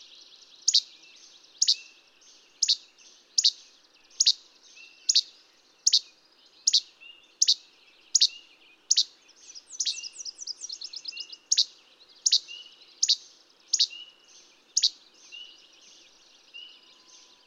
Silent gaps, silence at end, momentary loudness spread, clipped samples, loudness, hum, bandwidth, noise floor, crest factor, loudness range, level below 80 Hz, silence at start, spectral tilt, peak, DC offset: none; 0.85 s; 22 LU; under 0.1%; -25 LUFS; none; 16 kHz; -60 dBFS; 24 dB; 5 LU; -88 dBFS; 0.65 s; 6 dB/octave; -6 dBFS; under 0.1%